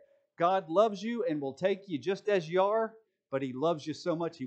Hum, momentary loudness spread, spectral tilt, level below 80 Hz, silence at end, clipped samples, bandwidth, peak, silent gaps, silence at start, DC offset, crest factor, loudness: none; 7 LU; -6 dB/octave; -88 dBFS; 0 s; under 0.1%; 8.6 kHz; -12 dBFS; none; 0.4 s; under 0.1%; 20 dB; -31 LUFS